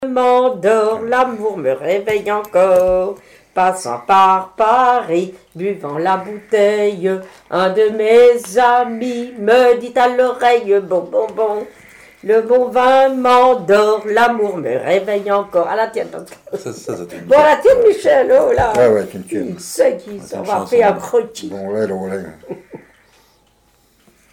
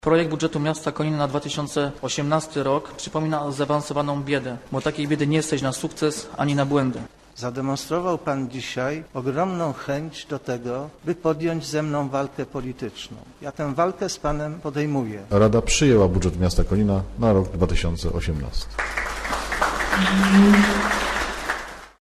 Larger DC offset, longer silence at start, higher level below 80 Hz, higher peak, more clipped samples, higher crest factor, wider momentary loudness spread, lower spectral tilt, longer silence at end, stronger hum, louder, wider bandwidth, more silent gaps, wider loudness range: neither; about the same, 0 s vs 0.05 s; second, -50 dBFS vs -36 dBFS; first, -2 dBFS vs -6 dBFS; neither; about the same, 12 dB vs 16 dB; first, 15 LU vs 11 LU; about the same, -5 dB/octave vs -5.5 dB/octave; first, 1.55 s vs 0.15 s; neither; first, -14 LUFS vs -23 LUFS; first, 16 kHz vs 13.5 kHz; neither; about the same, 5 LU vs 7 LU